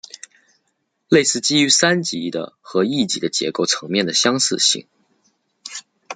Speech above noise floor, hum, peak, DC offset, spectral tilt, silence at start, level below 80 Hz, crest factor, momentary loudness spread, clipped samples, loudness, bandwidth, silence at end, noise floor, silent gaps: 52 dB; none; -2 dBFS; under 0.1%; -2.5 dB/octave; 1.1 s; -64 dBFS; 20 dB; 19 LU; under 0.1%; -17 LUFS; 11 kHz; 0 s; -71 dBFS; none